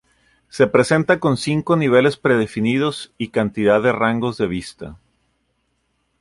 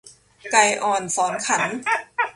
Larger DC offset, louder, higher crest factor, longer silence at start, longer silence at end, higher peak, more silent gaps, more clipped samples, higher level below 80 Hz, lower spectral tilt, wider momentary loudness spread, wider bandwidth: neither; about the same, -18 LUFS vs -20 LUFS; about the same, 16 dB vs 20 dB; first, 0.55 s vs 0.05 s; first, 1.25 s vs 0.05 s; about the same, -2 dBFS vs -2 dBFS; neither; neither; first, -52 dBFS vs -66 dBFS; first, -6 dB/octave vs -1.5 dB/octave; first, 13 LU vs 6 LU; about the same, 11.5 kHz vs 11.5 kHz